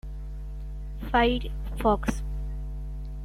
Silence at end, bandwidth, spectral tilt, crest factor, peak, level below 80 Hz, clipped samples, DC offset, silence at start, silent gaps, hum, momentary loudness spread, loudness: 0 s; 13.5 kHz; -6 dB/octave; 20 dB; -10 dBFS; -34 dBFS; under 0.1%; under 0.1%; 0.05 s; none; 50 Hz at -30 dBFS; 16 LU; -29 LUFS